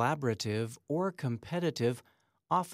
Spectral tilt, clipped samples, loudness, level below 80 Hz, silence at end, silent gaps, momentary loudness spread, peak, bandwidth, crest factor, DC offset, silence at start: -6 dB/octave; under 0.1%; -34 LUFS; -72 dBFS; 0 s; none; 5 LU; -16 dBFS; 16 kHz; 18 dB; under 0.1%; 0 s